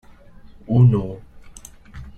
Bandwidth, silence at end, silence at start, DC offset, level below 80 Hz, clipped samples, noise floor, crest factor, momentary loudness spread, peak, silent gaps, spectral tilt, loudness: 8.8 kHz; 0.1 s; 0.7 s; under 0.1%; -44 dBFS; under 0.1%; -43 dBFS; 18 dB; 26 LU; -4 dBFS; none; -9.5 dB/octave; -17 LUFS